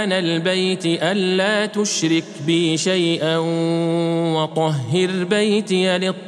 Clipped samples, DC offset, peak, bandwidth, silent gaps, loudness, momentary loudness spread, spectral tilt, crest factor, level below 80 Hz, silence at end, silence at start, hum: under 0.1%; under 0.1%; -2 dBFS; 12 kHz; none; -19 LUFS; 2 LU; -4.5 dB/octave; 16 dB; -76 dBFS; 0 s; 0 s; none